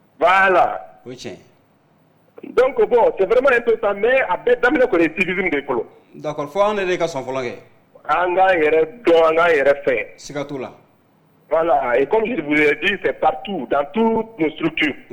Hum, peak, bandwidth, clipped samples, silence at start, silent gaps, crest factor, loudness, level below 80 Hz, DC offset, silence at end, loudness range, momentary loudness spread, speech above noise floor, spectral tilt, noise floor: none; -6 dBFS; 18 kHz; under 0.1%; 0.2 s; none; 12 dB; -17 LUFS; -50 dBFS; under 0.1%; 0.1 s; 3 LU; 14 LU; 39 dB; -5.5 dB/octave; -56 dBFS